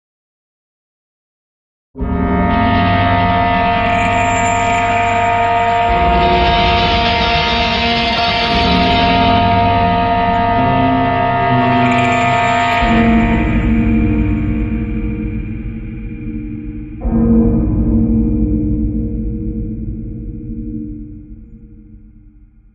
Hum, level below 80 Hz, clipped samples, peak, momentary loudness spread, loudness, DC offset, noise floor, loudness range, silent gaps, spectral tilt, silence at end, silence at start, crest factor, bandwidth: none; -24 dBFS; under 0.1%; 0 dBFS; 14 LU; -13 LUFS; under 0.1%; -43 dBFS; 8 LU; none; -6 dB/octave; 0.45 s; 1.95 s; 14 dB; 8 kHz